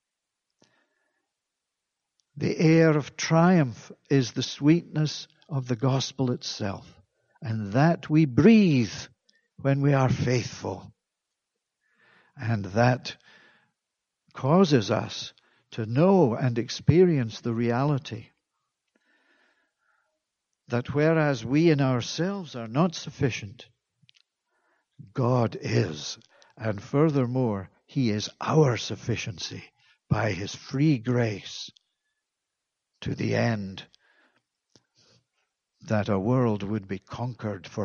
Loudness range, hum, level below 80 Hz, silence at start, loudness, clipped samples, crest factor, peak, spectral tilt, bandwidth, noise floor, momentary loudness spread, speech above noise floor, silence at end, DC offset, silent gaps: 8 LU; none; -60 dBFS; 2.35 s; -25 LUFS; under 0.1%; 22 dB; -4 dBFS; -6.5 dB/octave; 7.2 kHz; -85 dBFS; 16 LU; 61 dB; 0 s; under 0.1%; none